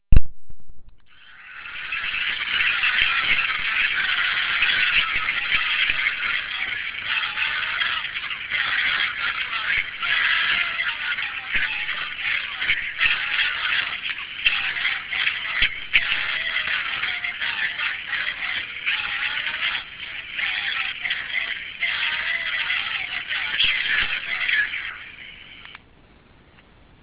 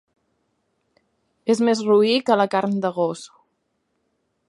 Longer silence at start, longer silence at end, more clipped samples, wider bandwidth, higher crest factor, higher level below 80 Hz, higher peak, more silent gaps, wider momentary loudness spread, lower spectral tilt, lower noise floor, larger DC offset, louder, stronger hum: second, 0.1 s vs 1.45 s; about the same, 1.25 s vs 1.2 s; neither; second, 4 kHz vs 11.5 kHz; about the same, 22 dB vs 20 dB; first, -36 dBFS vs -74 dBFS; first, 0 dBFS vs -4 dBFS; neither; about the same, 8 LU vs 9 LU; second, 1.5 dB/octave vs -5.5 dB/octave; second, -52 dBFS vs -72 dBFS; neither; about the same, -21 LUFS vs -20 LUFS; neither